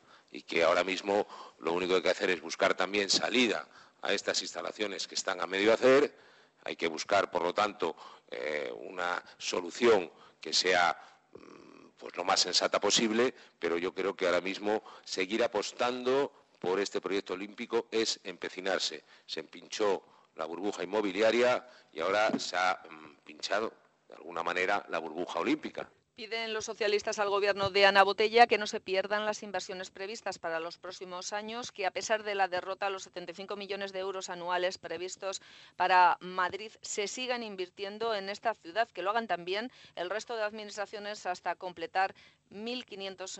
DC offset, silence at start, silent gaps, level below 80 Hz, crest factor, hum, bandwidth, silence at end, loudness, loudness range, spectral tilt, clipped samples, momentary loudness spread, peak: under 0.1%; 0.35 s; none; -74 dBFS; 24 dB; none; 8.4 kHz; 0 s; -31 LUFS; 7 LU; -2.5 dB/octave; under 0.1%; 15 LU; -8 dBFS